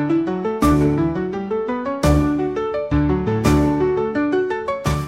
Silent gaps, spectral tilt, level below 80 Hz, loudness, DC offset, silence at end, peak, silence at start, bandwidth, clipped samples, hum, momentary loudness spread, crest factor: none; -7 dB/octave; -30 dBFS; -19 LUFS; under 0.1%; 0 s; -4 dBFS; 0 s; 16 kHz; under 0.1%; none; 7 LU; 16 dB